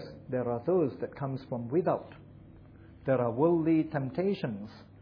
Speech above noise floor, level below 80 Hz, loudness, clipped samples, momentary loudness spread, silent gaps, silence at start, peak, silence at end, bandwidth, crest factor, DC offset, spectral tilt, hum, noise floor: 22 dB; -62 dBFS; -31 LUFS; under 0.1%; 11 LU; none; 0 s; -12 dBFS; 0 s; 5.4 kHz; 18 dB; under 0.1%; -10.5 dB/octave; none; -52 dBFS